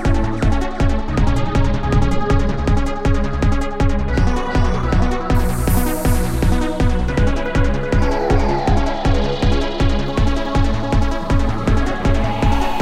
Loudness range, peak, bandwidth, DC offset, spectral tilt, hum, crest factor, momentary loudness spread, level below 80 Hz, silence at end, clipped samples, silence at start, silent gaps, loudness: 1 LU; -2 dBFS; 15.5 kHz; under 0.1%; -6.5 dB/octave; none; 12 dB; 2 LU; -18 dBFS; 0 s; under 0.1%; 0 s; none; -19 LUFS